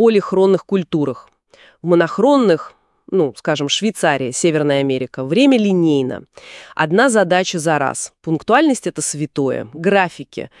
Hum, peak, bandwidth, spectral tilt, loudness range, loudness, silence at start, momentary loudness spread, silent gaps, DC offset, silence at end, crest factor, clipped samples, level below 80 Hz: none; 0 dBFS; 12 kHz; -4.5 dB/octave; 2 LU; -16 LUFS; 0 s; 11 LU; none; under 0.1%; 0.15 s; 16 dB; under 0.1%; -62 dBFS